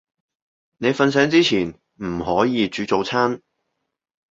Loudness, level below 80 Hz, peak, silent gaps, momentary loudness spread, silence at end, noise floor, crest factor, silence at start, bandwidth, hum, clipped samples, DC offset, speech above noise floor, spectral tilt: -20 LUFS; -52 dBFS; -2 dBFS; none; 13 LU; 0.95 s; -76 dBFS; 20 dB; 0.8 s; 7.8 kHz; none; under 0.1%; under 0.1%; 57 dB; -5 dB/octave